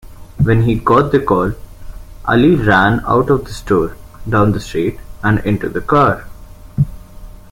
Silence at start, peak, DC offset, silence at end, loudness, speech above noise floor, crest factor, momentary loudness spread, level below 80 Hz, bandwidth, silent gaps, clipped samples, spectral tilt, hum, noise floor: 0.05 s; 0 dBFS; under 0.1%; 0.1 s; -15 LUFS; 21 dB; 14 dB; 10 LU; -32 dBFS; 16.5 kHz; none; under 0.1%; -7.5 dB/octave; none; -34 dBFS